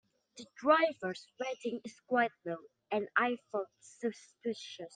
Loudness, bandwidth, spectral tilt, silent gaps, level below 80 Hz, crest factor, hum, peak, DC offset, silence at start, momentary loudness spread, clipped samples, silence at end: -35 LUFS; 9.6 kHz; -4.5 dB/octave; none; -86 dBFS; 22 dB; none; -14 dBFS; under 0.1%; 0.35 s; 15 LU; under 0.1%; 0.05 s